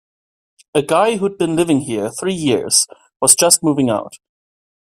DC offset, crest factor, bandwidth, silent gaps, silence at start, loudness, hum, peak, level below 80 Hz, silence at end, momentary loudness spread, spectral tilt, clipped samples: under 0.1%; 18 dB; 16 kHz; none; 0.75 s; -15 LUFS; none; 0 dBFS; -58 dBFS; 0.65 s; 11 LU; -3 dB/octave; under 0.1%